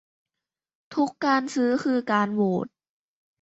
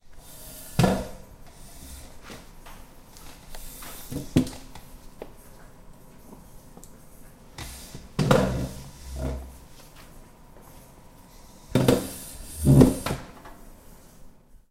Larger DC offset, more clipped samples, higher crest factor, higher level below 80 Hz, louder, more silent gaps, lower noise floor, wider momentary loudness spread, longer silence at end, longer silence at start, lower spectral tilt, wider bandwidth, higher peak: neither; neither; second, 18 dB vs 26 dB; second, -72 dBFS vs -42 dBFS; about the same, -25 LUFS vs -25 LUFS; neither; first, -88 dBFS vs -49 dBFS; second, 7 LU vs 27 LU; first, 0.75 s vs 0.4 s; first, 0.9 s vs 0.1 s; about the same, -6 dB/octave vs -6.5 dB/octave; second, 8.2 kHz vs 16 kHz; second, -8 dBFS vs -2 dBFS